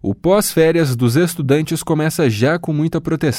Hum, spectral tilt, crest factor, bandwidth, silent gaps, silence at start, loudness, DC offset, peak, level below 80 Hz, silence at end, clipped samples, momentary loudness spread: none; -6 dB/octave; 14 dB; 17 kHz; none; 0.05 s; -16 LUFS; under 0.1%; -2 dBFS; -46 dBFS; 0 s; under 0.1%; 5 LU